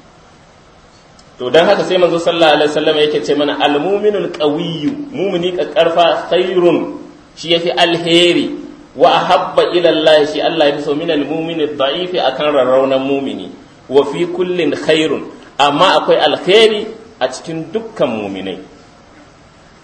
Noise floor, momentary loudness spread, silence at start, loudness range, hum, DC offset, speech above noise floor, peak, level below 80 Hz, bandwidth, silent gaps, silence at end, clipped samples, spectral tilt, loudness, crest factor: -43 dBFS; 13 LU; 1.4 s; 3 LU; none; under 0.1%; 30 dB; 0 dBFS; -54 dBFS; 10.5 kHz; none; 1.15 s; 0.1%; -4.5 dB/octave; -13 LUFS; 14 dB